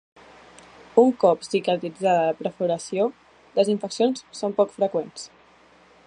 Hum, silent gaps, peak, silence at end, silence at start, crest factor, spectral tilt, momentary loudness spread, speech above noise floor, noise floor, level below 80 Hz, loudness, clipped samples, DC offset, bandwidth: none; none; -2 dBFS; 0.8 s; 0.95 s; 22 dB; -5.5 dB/octave; 10 LU; 32 dB; -54 dBFS; -70 dBFS; -23 LUFS; under 0.1%; under 0.1%; 10.5 kHz